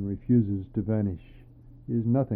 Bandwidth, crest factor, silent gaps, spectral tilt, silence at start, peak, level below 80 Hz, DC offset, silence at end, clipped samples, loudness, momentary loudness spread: 3.3 kHz; 16 dB; none; -14 dB/octave; 0 s; -12 dBFS; -50 dBFS; under 0.1%; 0 s; under 0.1%; -27 LUFS; 12 LU